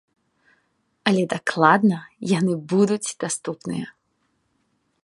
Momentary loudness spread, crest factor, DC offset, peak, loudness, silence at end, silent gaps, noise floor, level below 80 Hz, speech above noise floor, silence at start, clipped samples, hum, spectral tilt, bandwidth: 13 LU; 22 dB; under 0.1%; -2 dBFS; -22 LUFS; 1.15 s; none; -70 dBFS; -68 dBFS; 49 dB; 1.05 s; under 0.1%; none; -5 dB/octave; 11.5 kHz